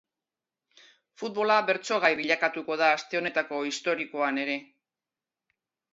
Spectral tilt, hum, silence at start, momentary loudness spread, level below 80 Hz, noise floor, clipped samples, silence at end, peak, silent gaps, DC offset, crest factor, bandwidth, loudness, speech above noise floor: -3 dB/octave; none; 1.2 s; 7 LU; -80 dBFS; under -90 dBFS; under 0.1%; 1.3 s; -8 dBFS; none; under 0.1%; 22 dB; 8 kHz; -27 LUFS; over 63 dB